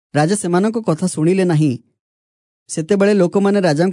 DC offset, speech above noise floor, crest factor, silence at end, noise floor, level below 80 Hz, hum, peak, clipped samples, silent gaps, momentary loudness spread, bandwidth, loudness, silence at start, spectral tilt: under 0.1%; over 75 dB; 14 dB; 0 s; under -90 dBFS; -66 dBFS; none; -2 dBFS; under 0.1%; 1.99-2.66 s; 6 LU; 11 kHz; -16 LUFS; 0.15 s; -6.5 dB/octave